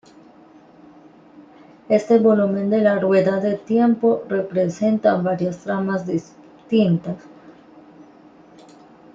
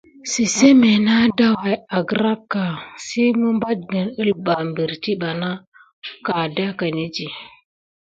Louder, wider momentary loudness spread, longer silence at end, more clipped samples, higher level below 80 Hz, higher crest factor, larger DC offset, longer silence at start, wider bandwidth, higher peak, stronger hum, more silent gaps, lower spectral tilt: about the same, -19 LUFS vs -19 LUFS; second, 8 LU vs 14 LU; first, 1.65 s vs 0.55 s; neither; second, -64 dBFS vs -58 dBFS; about the same, 18 dB vs 18 dB; neither; first, 1.9 s vs 0.25 s; second, 7.6 kHz vs 9.2 kHz; second, -4 dBFS vs 0 dBFS; neither; second, none vs 5.67-5.72 s, 5.93-6.02 s; first, -8 dB/octave vs -4.5 dB/octave